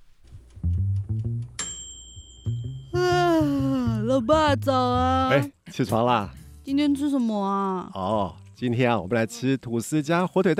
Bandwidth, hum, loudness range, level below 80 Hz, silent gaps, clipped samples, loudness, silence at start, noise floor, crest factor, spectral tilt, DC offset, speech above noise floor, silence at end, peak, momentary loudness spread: 15.5 kHz; none; 4 LU; -44 dBFS; none; under 0.1%; -24 LUFS; 0.3 s; -47 dBFS; 18 dB; -6 dB/octave; under 0.1%; 24 dB; 0 s; -6 dBFS; 12 LU